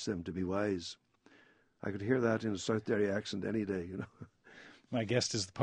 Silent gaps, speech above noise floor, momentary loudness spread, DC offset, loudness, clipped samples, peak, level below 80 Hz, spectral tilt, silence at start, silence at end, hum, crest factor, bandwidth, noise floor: none; 31 dB; 21 LU; under 0.1%; -35 LUFS; under 0.1%; -16 dBFS; -68 dBFS; -5 dB/octave; 0 s; 0 s; none; 20 dB; 10 kHz; -66 dBFS